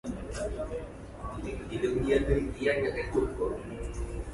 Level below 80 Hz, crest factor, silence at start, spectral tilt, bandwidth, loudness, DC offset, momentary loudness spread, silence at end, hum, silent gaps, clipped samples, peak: -40 dBFS; 18 dB; 0.05 s; -6.5 dB/octave; 11.5 kHz; -32 LUFS; under 0.1%; 12 LU; 0 s; none; none; under 0.1%; -14 dBFS